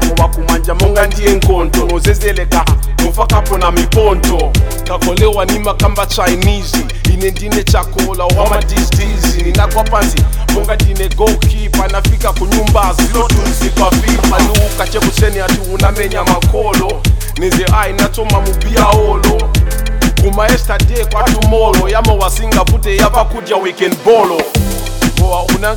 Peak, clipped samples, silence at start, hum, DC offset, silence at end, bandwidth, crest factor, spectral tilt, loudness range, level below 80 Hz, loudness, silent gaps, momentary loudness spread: 0 dBFS; 0.2%; 0 s; none; under 0.1%; 0 s; 19 kHz; 10 dB; -5 dB/octave; 1 LU; -14 dBFS; -12 LUFS; none; 4 LU